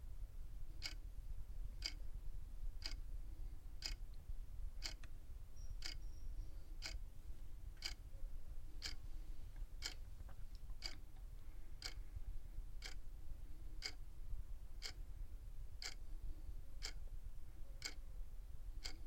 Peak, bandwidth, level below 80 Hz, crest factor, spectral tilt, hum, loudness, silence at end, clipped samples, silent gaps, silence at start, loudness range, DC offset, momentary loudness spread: -26 dBFS; 16.5 kHz; -50 dBFS; 20 dB; -2.5 dB/octave; none; -54 LUFS; 0 s; under 0.1%; none; 0 s; 2 LU; under 0.1%; 8 LU